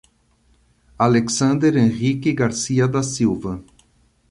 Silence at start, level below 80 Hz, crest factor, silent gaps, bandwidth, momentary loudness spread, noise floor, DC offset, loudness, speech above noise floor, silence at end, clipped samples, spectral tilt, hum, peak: 1 s; -50 dBFS; 18 dB; none; 11.5 kHz; 6 LU; -59 dBFS; under 0.1%; -19 LUFS; 41 dB; 0.7 s; under 0.1%; -5.5 dB/octave; none; -2 dBFS